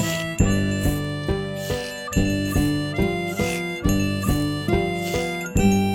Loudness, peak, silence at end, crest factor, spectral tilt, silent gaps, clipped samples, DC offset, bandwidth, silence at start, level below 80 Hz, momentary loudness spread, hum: -23 LUFS; -4 dBFS; 0 s; 18 dB; -5.5 dB/octave; none; under 0.1%; under 0.1%; 17 kHz; 0 s; -32 dBFS; 5 LU; none